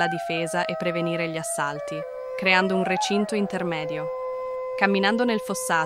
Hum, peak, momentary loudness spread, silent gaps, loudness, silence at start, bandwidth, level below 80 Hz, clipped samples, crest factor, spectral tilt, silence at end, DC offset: none; -4 dBFS; 10 LU; none; -25 LUFS; 0 s; 15.5 kHz; -64 dBFS; under 0.1%; 20 dB; -4 dB/octave; 0 s; under 0.1%